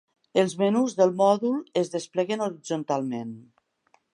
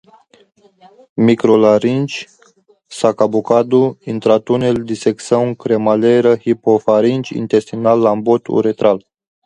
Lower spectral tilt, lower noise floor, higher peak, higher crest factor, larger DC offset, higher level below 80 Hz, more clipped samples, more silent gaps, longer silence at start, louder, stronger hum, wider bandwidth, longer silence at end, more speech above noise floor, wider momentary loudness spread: second, -5.5 dB/octave vs -7 dB/octave; first, -66 dBFS vs -52 dBFS; second, -8 dBFS vs 0 dBFS; about the same, 18 dB vs 14 dB; neither; second, -78 dBFS vs -56 dBFS; neither; neither; second, 0.35 s vs 1.15 s; second, -25 LUFS vs -14 LUFS; neither; about the same, 11.5 kHz vs 11 kHz; first, 0.75 s vs 0.45 s; about the same, 42 dB vs 39 dB; first, 11 LU vs 7 LU